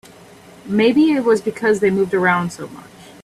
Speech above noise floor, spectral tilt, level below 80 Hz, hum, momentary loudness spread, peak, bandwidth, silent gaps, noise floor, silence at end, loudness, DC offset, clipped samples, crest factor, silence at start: 27 dB; -6 dB/octave; -58 dBFS; none; 12 LU; -2 dBFS; 13.5 kHz; none; -43 dBFS; 0.2 s; -17 LUFS; under 0.1%; under 0.1%; 16 dB; 0.65 s